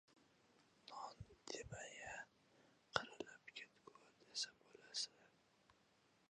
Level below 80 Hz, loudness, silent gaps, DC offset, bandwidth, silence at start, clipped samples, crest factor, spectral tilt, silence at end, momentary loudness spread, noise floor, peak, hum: -76 dBFS; -51 LUFS; none; under 0.1%; 10 kHz; 0.1 s; under 0.1%; 38 dB; -1.5 dB/octave; 0.6 s; 18 LU; -77 dBFS; -18 dBFS; none